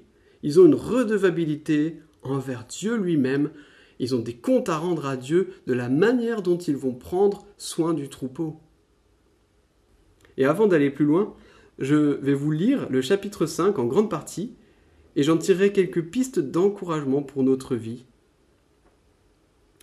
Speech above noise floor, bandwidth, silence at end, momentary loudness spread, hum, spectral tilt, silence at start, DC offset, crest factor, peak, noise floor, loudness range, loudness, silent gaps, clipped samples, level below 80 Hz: 40 dB; 14 kHz; 1.85 s; 12 LU; none; -6.5 dB/octave; 0.45 s; under 0.1%; 18 dB; -4 dBFS; -63 dBFS; 5 LU; -23 LUFS; none; under 0.1%; -62 dBFS